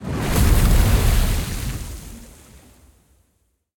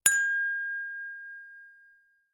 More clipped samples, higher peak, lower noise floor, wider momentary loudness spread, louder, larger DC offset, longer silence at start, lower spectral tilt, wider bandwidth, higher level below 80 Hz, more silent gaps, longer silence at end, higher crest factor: neither; about the same, -4 dBFS vs -4 dBFS; first, -67 dBFS vs -63 dBFS; about the same, 20 LU vs 22 LU; first, -20 LUFS vs -29 LUFS; neither; about the same, 0 s vs 0.05 s; first, -5 dB/octave vs 3 dB/octave; about the same, 18 kHz vs 18 kHz; first, -22 dBFS vs -72 dBFS; neither; first, 1.5 s vs 0.6 s; second, 16 dB vs 28 dB